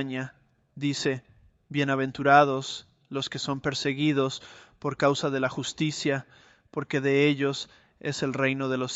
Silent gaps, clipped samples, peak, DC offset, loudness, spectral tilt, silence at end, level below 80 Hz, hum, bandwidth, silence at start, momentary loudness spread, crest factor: none; under 0.1%; -6 dBFS; under 0.1%; -27 LUFS; -5 dB/octave; 0 s; -66 dBFS; none; 8.2 kHz; 0 s; 14 LU; 22 dB